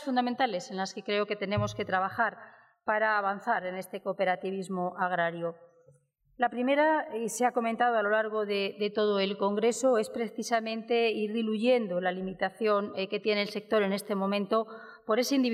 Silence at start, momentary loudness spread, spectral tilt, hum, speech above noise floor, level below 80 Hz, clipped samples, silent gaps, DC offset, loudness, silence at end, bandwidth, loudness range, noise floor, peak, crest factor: 0 s; 8 LU; -4.5 dB/octave; none; 36 dB; -70 dBFS; under 0.1%; none; under 0.1%; -29 LUFS; 0 s; 15.5 kHz; 3 LU; -65 dBFS; -14 dBFS; 16 dB